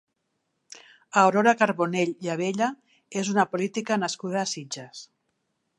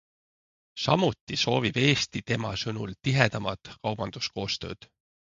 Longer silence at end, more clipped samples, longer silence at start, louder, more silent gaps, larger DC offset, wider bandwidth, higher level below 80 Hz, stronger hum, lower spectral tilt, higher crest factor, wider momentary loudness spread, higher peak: about the same, 0.75 s vs 0.65 s; neither; about the same, 0.7 s vs 0.75 s; about the same, -25 LUFS vs -27 LUFS; second, none vs 1.21-1.27 s; neither; first, 11.5 kHz vs 7.6 kHz; second, -78 dBFS vs -56 dBFS; neither; about the same, -4.5 dB/octave vs -5 dB/octave; about the same, 22 dB vs 24 dB; first, 14 LU vs 11 LU; about the same, -4 dBFS vs -4 dBFS